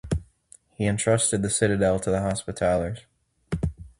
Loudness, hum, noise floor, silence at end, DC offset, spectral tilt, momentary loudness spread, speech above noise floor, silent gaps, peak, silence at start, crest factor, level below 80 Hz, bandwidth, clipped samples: -25 LUFS; none; -56 dBFS; 0.1 s; under 0.1%; -5 dB/octave; 10 LU; 32 dB; none; -6 dBFS; 0.05 s; 20 dB; -42 dBFS; 11.5 kHz; under 0.1%